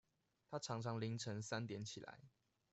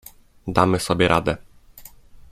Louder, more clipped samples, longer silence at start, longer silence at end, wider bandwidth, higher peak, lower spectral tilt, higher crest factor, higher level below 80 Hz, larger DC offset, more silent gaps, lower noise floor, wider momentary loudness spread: second, -47 LUFS vs -20 LUFS; neither; about the same, 0.5 s vs 0.45 s; first, 0.45 s vs 0.1 s; second, 8.2 kHz vs 16 kHz; second, -30 dBFS vs 0 dBFS; about the same, -5 dB/octave vs -5.5 dB/octave; about the same, 18 dB vs 22 dB; second, -80 dBFS vs -44 dBFS; neither; neither; first, -72 dBFS vs -45 dBFS; about the same, 11 LU vs 13 LU